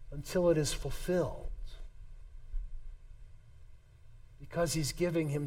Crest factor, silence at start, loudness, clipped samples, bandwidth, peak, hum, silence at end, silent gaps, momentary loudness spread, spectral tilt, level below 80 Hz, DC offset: 18 dB; 0 s; -33 LUFS; under 0.1%; 16.5 kHz; -16 dBFS; none; 0 s; none; 25 LU; -5 dB/octave; -44 dBFS; under 0.1%